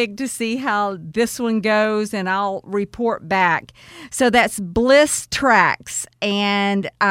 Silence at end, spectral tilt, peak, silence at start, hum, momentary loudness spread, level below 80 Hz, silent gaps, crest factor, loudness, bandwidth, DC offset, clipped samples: 0 s; -3.5 dB/octave; 0 dBFS; 0 s; none; 9 LU; -48 dBFS; none; 18 dB; -18 LUFS; 16.5 kHz; under 0.1%; under 0.1%